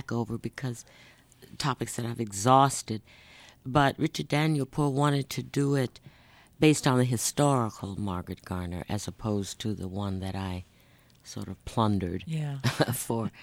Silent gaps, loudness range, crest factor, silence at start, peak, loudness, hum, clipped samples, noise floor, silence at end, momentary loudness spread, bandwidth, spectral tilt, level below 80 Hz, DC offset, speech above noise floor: none; 7 LU; 22 dB; 0.1 s; -6 dBFS; -29 LUFS; none; under 0.1%; -59 dBFS; 0 s; 13 LU; 16.5 kHz; -5.5 dB/octave; -56 dBFS; under 0.1%; 31 dB